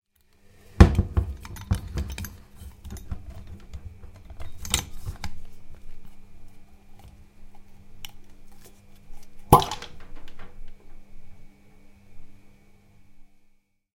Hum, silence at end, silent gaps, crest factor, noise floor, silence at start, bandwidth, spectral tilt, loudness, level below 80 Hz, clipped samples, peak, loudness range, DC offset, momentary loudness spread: none; 0.7 s; none; 28 dB; -60 dBFS; 0.7 s; 16.5 kHz; -5.5 dB/octave; -25 LUFS; -34 dBFS; under 0.1%; 0 dBFS; 24 LU; under 0.1%; 30 LU